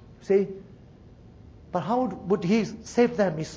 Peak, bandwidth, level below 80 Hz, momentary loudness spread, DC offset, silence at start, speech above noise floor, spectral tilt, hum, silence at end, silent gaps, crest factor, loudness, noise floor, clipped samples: -8 dBFS; 8 kHz; -54 dBFS; 9 LU; under 0.1%; 0 s; 25 dB; -6.5 dB/octave; none; 0 s; none; 18 dB; -26 LUFS; -50 dBFS; under 0.1%